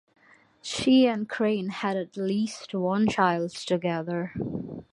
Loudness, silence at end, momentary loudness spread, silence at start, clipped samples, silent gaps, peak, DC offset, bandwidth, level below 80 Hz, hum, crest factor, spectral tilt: -26 LUFS; 0.1 s; 12 LU; 0.65 s; under 0.1%; none; -8 dBFS; under 0.1%; 11.5 kHz; -60 dBFS; none; 20 dB; -5.5 dB/octave